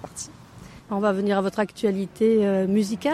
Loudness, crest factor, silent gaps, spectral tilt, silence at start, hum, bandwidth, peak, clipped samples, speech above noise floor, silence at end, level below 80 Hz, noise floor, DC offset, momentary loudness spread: -23 LUFS; 14 dB; none; -6 dB/octave; 0 s; none; 13.5 kHz; -10 dBFS; under 0.1%; 23 dB; 0 s; -58 dBFS; -45 dBFS; under 0.1%; 14 LU